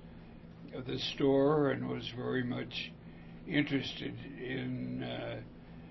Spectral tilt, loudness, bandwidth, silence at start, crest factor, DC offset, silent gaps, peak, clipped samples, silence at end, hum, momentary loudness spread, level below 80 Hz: -4.5 dB/octave; -35 LUFS; 6 kHz; 0 s; 18 dB; under 0.1%; none; -16 dBFS; under 0.1%; 0 s; none; 22 LU; -60 dBFS